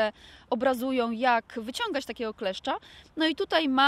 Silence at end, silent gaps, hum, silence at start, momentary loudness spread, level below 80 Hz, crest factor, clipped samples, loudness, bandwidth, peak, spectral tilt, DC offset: 0 s; none; none; 0 s; 9 LU; -62 dBFS; 18 dB; under 0.1%; -29 LUFS; 16 kHz; -10 dBFS; -3.5 dB/octave; under 0.1%